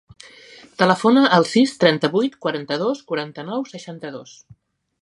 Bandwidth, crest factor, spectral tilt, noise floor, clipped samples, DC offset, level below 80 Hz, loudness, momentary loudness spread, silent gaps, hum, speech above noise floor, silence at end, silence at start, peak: 11.5 kHz; 20 dB; -5.5 dB/octave; -46 dBFS; under 0.1%; under 0.1%; -66 dBFS; -19 LUFS; 18 LU; none; none; 26 dB; 0.8 s; 0.8 s; 0 dBFS